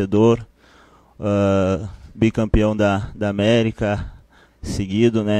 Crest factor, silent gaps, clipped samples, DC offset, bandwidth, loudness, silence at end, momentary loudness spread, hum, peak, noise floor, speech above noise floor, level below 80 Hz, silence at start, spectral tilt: 16 dB; none; under 0.1%; under 0.1%; 10.5 kHz; -19 LUFS; 0 s; 11 LU; none; -2 dBFS; -51 dBFS; 33 dB; -34 dBFS; 0 s; -7 dB/octave